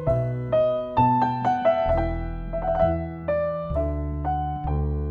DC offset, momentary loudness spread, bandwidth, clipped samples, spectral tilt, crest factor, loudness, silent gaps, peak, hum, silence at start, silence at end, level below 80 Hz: under 0.1%; 7 LU; 6.6 kHz; under 0.1%; -9.5 dB/octave; 16 dB; -24 LUFS; none; -8 dBFS; none; 0 s; 0 s; -32 dBFS